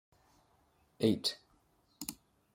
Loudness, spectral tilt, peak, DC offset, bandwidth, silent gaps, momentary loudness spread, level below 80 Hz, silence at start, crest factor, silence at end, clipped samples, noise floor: -36 LUFS; -4.5 dB/octave; -16 dBFS; under 0.1%; 16.5 kHz; none; 13 LU; -72 dBFS; 1 s; 24 dB; 0.4 s; under 0.1%; -71 dBFS